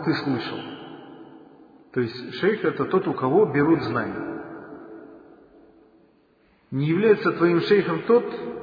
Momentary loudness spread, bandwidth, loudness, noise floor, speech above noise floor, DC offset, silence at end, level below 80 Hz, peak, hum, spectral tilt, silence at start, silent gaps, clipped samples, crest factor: 21 LU; 5 kHz; -23 LUFS; -60 dBFS; 39 dB; under 0.1%; 0 s; -64 dBFS; -6 dBFS; none; -9 dB/octave; 0 s; none; under 0.1%; 18 dB